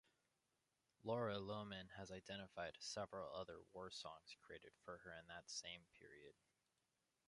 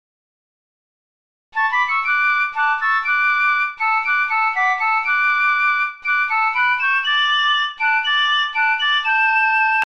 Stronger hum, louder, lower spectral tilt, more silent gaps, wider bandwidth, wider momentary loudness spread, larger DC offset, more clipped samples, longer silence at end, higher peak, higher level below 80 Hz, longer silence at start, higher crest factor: neither; second, -52 LUFS vs -16 LUFS; first, -4 dB/octave vs 2 dB/octave; neither; first, 11 kHz vs 9.4 kHz; first, 15 LU vs 3 LU; second, under 0.1% vs 0.5%; neither; first, 0.95 s vs 0 s; second, -32 dBFS vs -8 dBFS; second, -78 dBFS vs -66 dBFS; second, 1.05 s vs 1.55 s; first, 22 dB vs 12 dB